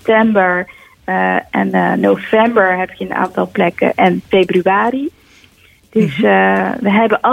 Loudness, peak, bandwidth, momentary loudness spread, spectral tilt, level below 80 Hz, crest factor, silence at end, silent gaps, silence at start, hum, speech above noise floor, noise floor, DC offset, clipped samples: -14 LUFS; 0 dBFS; 13.5 kHz; 8 LU; -7.5 dB/octave; -52 dBFS; 14 dB; 0 s; none; 0.05 s; none; 35 dB; -48 dBFS; under 0.1%; under 0.1%